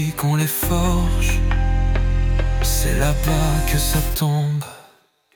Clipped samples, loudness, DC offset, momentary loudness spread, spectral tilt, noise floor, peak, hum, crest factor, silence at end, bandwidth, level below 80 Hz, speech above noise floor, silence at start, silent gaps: under 0.1%; -20 LUFS; under 0.1%; 2 LU; -5 dB/octave; -55 dBFS; -6 dBFS; none; 12 dB; 0.55 s; 19 kHz; -22 dBFS; 37 dB; 0 s; none